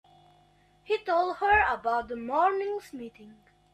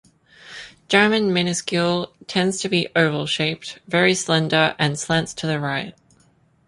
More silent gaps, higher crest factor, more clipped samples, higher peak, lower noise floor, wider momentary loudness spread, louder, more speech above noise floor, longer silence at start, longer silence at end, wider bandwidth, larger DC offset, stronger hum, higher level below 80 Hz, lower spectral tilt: neither; about the same, 18 dB vs 20 dB; neither; second, -12 dBFS vs -2 dBFS; first, -62 dBFS vs -58 dBFS; first, 17 LU vs 12 LU; second, -27 LUFS vs -20 LUFS; about the same, 35 dB vs 38 dB; first, 0.9 s vs 0.45 s; second, 0.4 s vs 0.75 s; first, 13.5 kHz vs 11.5 kHz; neither; neither; about the same, -54 dBFS vs -58 dBFS; about the same, -5 dB/octave vs -4 dB/octave